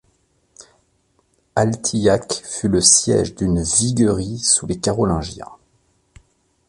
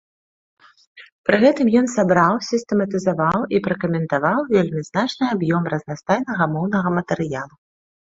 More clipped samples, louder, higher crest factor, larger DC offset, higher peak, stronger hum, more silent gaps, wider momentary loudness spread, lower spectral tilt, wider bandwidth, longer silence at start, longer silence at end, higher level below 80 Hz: neither; first, -17 LUFS vs -20 LUFS; about the same, 20 dB vs 18 dB; neither; about the same, 0 dBFS vs -2 dBFS; neither; second, none vs 1.12-1.24 s; first, 13 LU vs 8 LU; second, -4 dB/octave vs -6.5 dB/octave; first, 11.5 kHz vs 7.8 kHz; first, 1.55 s vs 0.95 s; first, 1.15 s vs 0.6 s; first, -40 dBFS vs -58 dBFS